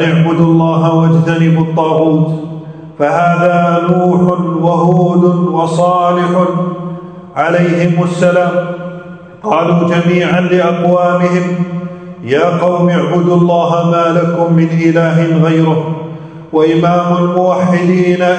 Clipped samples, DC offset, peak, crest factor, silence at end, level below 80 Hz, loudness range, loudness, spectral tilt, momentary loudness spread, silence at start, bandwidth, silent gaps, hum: 0.1%; under 0.1%; 0 dBFS; 10 dB; 0 s; -52 dBFS; 2 LU; -11 LUFS; -8 dB/octave; 12 LU; 0 s; 9 kHz; none; none